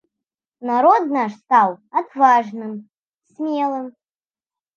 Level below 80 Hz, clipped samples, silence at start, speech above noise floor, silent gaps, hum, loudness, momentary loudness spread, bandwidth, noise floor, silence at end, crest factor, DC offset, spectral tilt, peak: -80 dBFS; under 0.1%; 0.6 s; over 72 dB; 2.98-3.02 s; none; -18 LUFS; 16 LU; 7 kHz; under -90 dBFS; 0.85 s; 18 dB; under 0.1%; -6 dB/octave; -2 dBFS